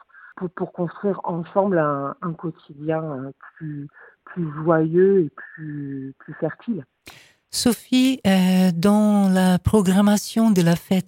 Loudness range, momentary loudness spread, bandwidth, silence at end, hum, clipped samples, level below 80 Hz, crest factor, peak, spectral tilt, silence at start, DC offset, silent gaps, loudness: 8 LU; 17 LU; 16.5 kHz; 0.05 s; none; under 0.1%; -50 dBFS; 18 dB; -4 dBFS; -6 dB/octave; 0.25 s; under 0.1%; none; -20 LUFS